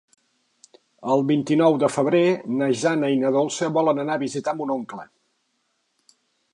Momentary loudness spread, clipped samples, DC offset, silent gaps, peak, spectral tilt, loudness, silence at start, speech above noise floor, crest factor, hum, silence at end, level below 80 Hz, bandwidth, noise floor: 9 LU; under 0.1%; under 0.1%; none; -6 dBFS; -5.5 dB/octave; -21 LUFS; 1 s; 50 dB; 18 dB; none; 1.5 s; -74 dBFS; 11 kHz; -71 dBFS